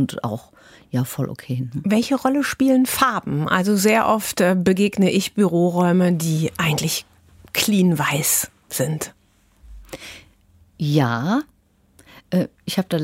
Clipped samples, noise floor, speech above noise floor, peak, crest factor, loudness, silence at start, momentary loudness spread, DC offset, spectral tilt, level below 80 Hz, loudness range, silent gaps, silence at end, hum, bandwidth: under 0.1%; -55 dBFS; 36 dB; -2 dBFS; 18 dB; -20 LUFS; 0 s; 11 LU; under 0.1%; -5 dB/octave; -54 dBFS; 7 LU; none; 0 s; none; 16 kHz